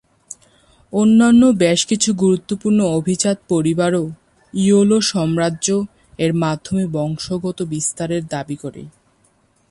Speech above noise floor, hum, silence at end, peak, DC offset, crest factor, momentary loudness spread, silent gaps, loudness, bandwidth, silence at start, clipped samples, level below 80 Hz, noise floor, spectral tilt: 42 dB; none; 0.8 s; -2 dBFS; under 0.1%; 14 dB; 16 LU; none; -17 LUFS; 11.5 kHz; 0.3 s; under 0.1%; -52 dBFS; -59 dBFS; -5 dB/octave